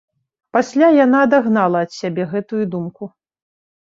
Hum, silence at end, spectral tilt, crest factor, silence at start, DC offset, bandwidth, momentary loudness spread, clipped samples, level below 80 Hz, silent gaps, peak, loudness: none; 0.8 s; -7 dB/octave; 16 dB; 0.55 s; under 0.1%; 7.8 kHz; 15 LU; under 0.1%; -64 dBFS; none; -2 dBFS; -16 LUFS